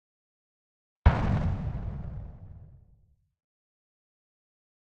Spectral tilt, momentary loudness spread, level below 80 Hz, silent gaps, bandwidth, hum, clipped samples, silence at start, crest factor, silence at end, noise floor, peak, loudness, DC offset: -9 dB/octave; 23 LU; -36 dBFS; none; 6.6 kHz; none; under 0.1%; 1.05 s; 28 dB; 2.25 s; -64 dBFS; -6 dBFS; -29 LUFS; under 0.1%